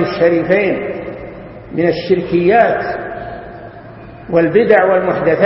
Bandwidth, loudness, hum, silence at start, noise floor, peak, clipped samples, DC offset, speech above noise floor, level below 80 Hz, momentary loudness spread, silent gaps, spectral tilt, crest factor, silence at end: 5.8 kHz; -14 LUFS; none; 0 s; -34 dBFS; 0 dBFS; under 0.1%; under 0.1%; 21 dB; -44 dBFS; 22 LU; none; -9.5 dB/octave; 14 dB; 0 s